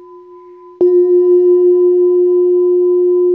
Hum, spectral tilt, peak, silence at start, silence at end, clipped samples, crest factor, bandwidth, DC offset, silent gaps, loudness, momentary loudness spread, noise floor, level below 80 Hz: none; -10.5 dB/octave; -4 dBFS; 0.15 s; 0 s; under 0.1%; 8 dB; 1.1 kHz; under 0.1%; none; -11 LUFS; 2 LU; -37 dBFS; -72 dBFS